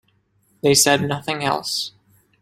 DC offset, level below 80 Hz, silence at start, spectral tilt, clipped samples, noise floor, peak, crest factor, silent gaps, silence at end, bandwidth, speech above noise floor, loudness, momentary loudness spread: under 0.1%; -56 dBFS; 0.65 s; -2.5 dB/octave; under 0.1%; -63 dBFS; -2 dBFS; 20 dB; none; 0.5 s; 16.5 kHz; 44 dB; -19 LUFS; 10 LU